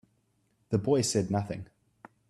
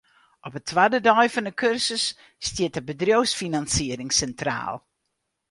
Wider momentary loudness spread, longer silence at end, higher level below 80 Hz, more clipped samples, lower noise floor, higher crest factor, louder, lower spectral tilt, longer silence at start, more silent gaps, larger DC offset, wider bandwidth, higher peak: about the same, 12 LU vs 14 LU; about the same, 0.65 s vs 0.7 s; second, -64 dBFS vs -50 dBFS; neither; second, -72 dBFS vs -78 dBFS; about the same, 18 dB vs 20 dB; second, -29 LUFS vs -23 LUFS; first, -5.5 dB/octave vs -3 dB/octave; first, 0.7 s vs 0.45 s; neither; neither; first, 13 kHz vs 11.5 kHz; second, -14 dBFS vs -4 dBFS